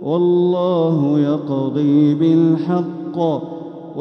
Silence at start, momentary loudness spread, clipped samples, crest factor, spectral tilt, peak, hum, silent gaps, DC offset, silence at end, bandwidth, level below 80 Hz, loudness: 0 s; 11 LU; under 0.1%; 12 dB; -10 dB/octave; -4 dBFS; none; none; under 0.1%; 0 s; 6 kHz; -68 dBFS; -17 LUFS